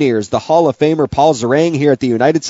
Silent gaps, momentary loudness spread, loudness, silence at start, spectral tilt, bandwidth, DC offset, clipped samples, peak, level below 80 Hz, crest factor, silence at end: none; 2 LU; -13 LUFS; 0 s; -5.5 dB/octave; 8 kHz; under 0.1%; under 0.1%; 0 dBFS; -46 dBFS; 12 dB; 0 s